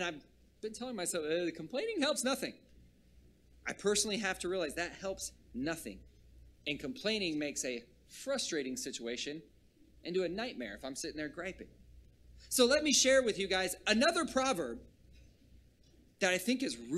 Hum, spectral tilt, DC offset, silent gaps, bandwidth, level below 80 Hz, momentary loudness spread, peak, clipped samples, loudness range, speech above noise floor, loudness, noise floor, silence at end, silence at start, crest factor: none; -2.5 dB/octave; under 0.1%; none; 15 kHz; -62 dBFS; 16 LU; -14 dBFS; under 0.1%; 9 LU; 30 dB; -34 LUFS; -65 dBFS; 0 s; 0 s; 22 dB